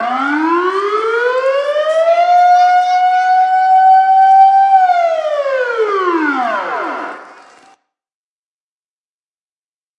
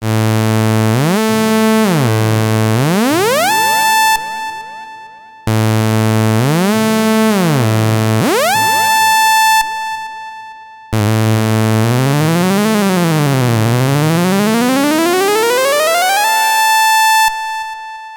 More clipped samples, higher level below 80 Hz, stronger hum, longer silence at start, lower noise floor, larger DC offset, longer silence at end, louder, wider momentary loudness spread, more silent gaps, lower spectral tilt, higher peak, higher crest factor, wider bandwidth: neither; second, -84 dBFS vs -50 dBFS; neither; about the same, 0 s vs 0 s; first, under -90 dBFS vs -35 dBFS; neither; first, 2.65 s vs 0 s; about the same, -11 LUFS vs -12 LUFS; second, 9 LU vs 12 LU; neither; second, -2.5 dB/octave vs -4.5 dB/octave; about the same, 0 dBFS vs -2 dBFS; about the same, 12 dB vs 10 dB; second, 8.6 kHz vs 19.5 kHz